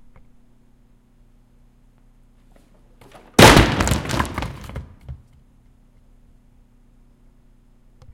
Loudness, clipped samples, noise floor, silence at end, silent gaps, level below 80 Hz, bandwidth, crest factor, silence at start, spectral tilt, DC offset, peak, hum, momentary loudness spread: -15 LUFS; under 0.1%; -53 dBFS; 3 s; none; -34 dBFS; 17 kHz; 22 dB; 3.4 s; -4 dB/octave; under 0.1%; 0 dBFS; none; 30 LU